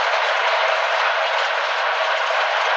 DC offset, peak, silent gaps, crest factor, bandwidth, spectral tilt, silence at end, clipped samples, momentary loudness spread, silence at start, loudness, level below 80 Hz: under 0.1%; -6 dBFS; none; 14 dB; 8.4 kHz; 5 dB/octave; 0 s; under 0.1%; 2 LU; 0 s; -19 LUFS; under -90 dBFS